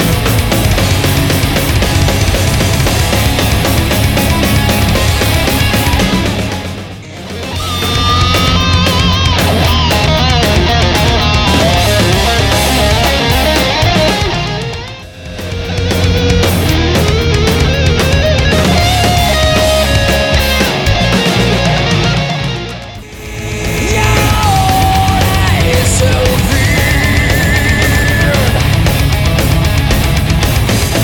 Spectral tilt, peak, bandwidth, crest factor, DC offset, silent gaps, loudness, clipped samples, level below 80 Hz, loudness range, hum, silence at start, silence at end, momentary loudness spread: -4.5 dB/octave; 0 dBFS; over 20 kHz; 10 dB; under 0.1%; none; -11 LUFS; under 0.1%; -18 dBFS; 3 LU; none; 0 s; 0 s; 7 LU